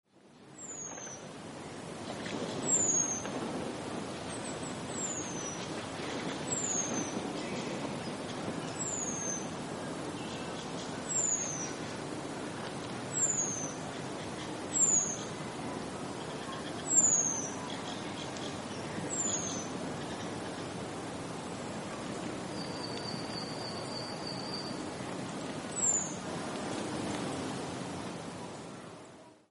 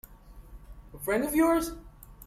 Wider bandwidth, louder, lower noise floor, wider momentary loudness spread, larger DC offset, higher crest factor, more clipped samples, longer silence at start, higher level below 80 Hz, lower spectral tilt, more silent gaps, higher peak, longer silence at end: second, 11.5 kHz vs 16 kHz; second, -34 LUFS vs -28 LUFS; first, -57 dBFS vs -50 dBFS; about the same, 12 LU vs 14 LU; neither; first, 22 dB vs 16 dB; neither; about the same, 0.15 s vs 0.1 s; second, -66 dBFS vs -48 dBFS; second, -2.5 dB/octave vs -4.5 dB/octave; neither; about the same, -14 dBFS vs -14 dBFS; about the same, 0.1 s vs 0 s